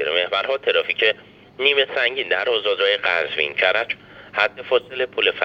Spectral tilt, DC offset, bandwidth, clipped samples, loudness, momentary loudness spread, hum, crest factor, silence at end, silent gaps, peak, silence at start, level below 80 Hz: -3.5 dB/octave; under 0.1%; 7.2 kHz; under 0.1%; -20 LUFS; 5 LU; none; 18 dB; 0 s; none; -4 dBFS; 0 s; -64 dBFS